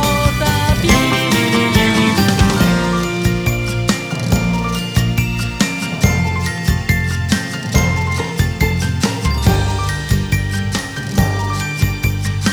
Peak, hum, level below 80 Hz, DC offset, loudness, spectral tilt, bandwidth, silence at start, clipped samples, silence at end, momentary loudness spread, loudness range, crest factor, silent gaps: 0 dBFS; none; -26 dBFS; under 0.1%; -16 LUFS; -5 dB/octave; over 20 kHz; 0 s; under 0.1%; 0 s; 6 LU; 4 LU; 16 dB; none